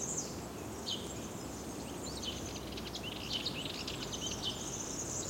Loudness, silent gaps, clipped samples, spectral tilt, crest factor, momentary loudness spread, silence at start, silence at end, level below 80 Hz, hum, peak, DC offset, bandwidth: -39 LUFS; none; under 0.1%; -2.5 dB/octave; 16 dB; 6 LU; 0 s; 0 s; -56 dBFS; none; -24 dBFS; under 0.1%; 16.5 kHz